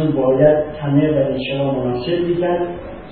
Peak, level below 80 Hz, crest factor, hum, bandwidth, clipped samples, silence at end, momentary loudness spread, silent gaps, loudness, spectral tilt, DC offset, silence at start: 0 dBFS; -42 dBFS; 16 dB; none; 4.7 kHz; under 0.1%; 0 s; 7 LU; none; -17 LUFS; -12.5 dB/octave; 0.5%; 0 s